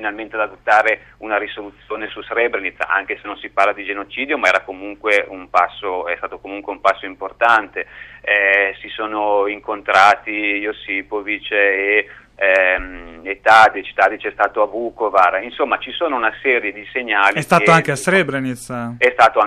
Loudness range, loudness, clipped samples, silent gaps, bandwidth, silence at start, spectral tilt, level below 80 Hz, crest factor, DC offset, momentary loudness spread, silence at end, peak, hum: 4 LU; -17 LUFS; under 0.1%; none; 14.5 kHz; 0 s; -4.5 dB/octave; -50 dBFS; 18 dB; under 0.1%; 14 LU; 0 s; 0 dBFS; none